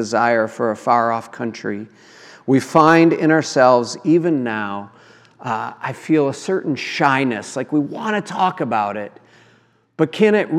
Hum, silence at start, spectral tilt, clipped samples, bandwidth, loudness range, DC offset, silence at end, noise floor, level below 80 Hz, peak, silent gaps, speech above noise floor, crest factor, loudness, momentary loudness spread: none; 0 s; -6 dB/octave; under 0.1%; 12 kHz; 5 LU; under 0.1%; 0 s; -56 dBFS; -72 dBFS; 0 dBFS; none; 38 dB; 18 dB; -18 LUFS; 14 LU